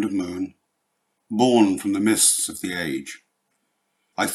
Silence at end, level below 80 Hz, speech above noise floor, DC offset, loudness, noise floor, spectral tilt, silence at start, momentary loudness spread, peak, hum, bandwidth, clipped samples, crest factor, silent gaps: 0 s; -68 dBFS; 53 dB; under 0.1%; -21 LUFS; -74 dBFS; -3 dB/octave; 0 s; 16 LU; -4 dBFS; none; 15 kHz; under 0.1%; 20 dB; none